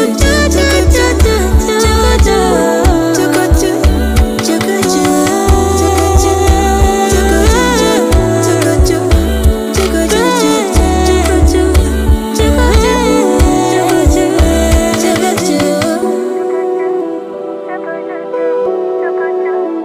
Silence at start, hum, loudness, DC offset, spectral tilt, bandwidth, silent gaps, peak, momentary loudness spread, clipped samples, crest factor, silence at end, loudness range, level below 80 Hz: 0 s; none; -11 LUFS; under 0.1%; -5 dB/octave; 16 kHz; none; 0 dBFS; 6 LU; under 0.1%; 10 dB; 0 s; 5 LU; -16 dBFS